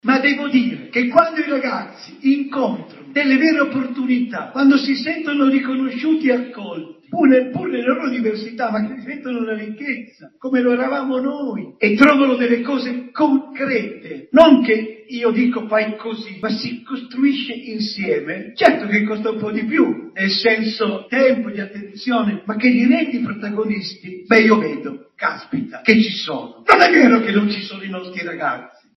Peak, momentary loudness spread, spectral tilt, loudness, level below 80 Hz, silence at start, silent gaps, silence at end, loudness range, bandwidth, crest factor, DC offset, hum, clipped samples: 0 dBFS; 15 LU; -6 dB/octave; -17 LUFS; -64 dBFS; 0.05 s; none; 0.3 s; 5 LU; 6.4 kHz; 18 dB; under 0.1%; none; under 0.1%